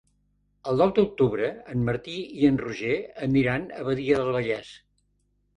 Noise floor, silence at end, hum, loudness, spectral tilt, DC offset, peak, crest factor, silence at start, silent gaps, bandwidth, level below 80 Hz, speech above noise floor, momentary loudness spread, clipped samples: -70 dBFS; 0.8 s; 50 Hz at -55 dBFS; -25 LUFS; -7.5 dB/octave; under 0.1%; -8 dBFS; 18 dB; 0.65 s; none; 10.5 kHz; -54 dBFS; 45 dB; 8 LU; under 0.1%